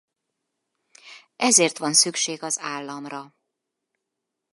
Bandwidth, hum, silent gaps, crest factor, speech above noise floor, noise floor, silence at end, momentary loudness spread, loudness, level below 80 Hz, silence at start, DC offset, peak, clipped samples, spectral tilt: 12 kHz; none; none; 24 dB; 60 dB; -83 dBFS; 1.25 s; 18 LU; -20 LUFS; -82 dBFS; 1.05 s; under 0.1%; -2 dBFS; under 0.1%; -1 dB/octave